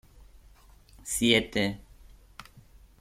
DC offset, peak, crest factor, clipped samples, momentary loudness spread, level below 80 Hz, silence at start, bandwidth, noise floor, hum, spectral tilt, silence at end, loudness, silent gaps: under 0.1%; -8 dBFS; 24 dB; under 0.1%; 26 LU; -52 dBFS; 1.05 s; 16 kHz; -55 dBFS; none; -3 dB/octave; 0.4 s; -26 LUFS; none